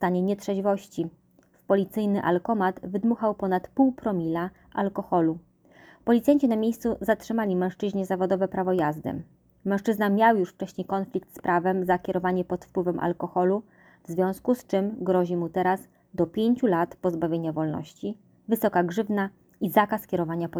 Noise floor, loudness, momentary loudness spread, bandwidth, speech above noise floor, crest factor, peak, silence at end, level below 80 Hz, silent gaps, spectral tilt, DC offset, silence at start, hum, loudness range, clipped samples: -54 dBFS; -26 LUFS; 10 LU; over 20 kHz; 29 dB; 20 dB; -6 dBFS; 0 s; -60 dBFS; none; -7.5 dB/octave; under 0.1%; 0 s; none; 2 LU; under 0.1%